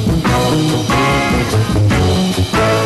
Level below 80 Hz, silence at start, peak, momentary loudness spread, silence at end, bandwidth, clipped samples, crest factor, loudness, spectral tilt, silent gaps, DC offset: -26 dBFS; 0 s; -6 dBFS; 2 LU; 0 s; 13 kHz; under 0.1%; 8 dB; -14 LUFS; -5.5 dB/octave; none; under 0.1%